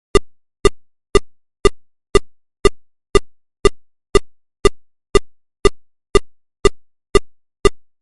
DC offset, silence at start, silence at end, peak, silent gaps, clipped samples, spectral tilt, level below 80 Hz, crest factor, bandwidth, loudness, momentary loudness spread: 0.1%; 0.15 s; 0.25 s; 0 dBFS; none; under 0.1%; -4.5 dB/octave; -26 dBFS; 18 dB; 11.5 kHz; -19 LUFS; 0 LU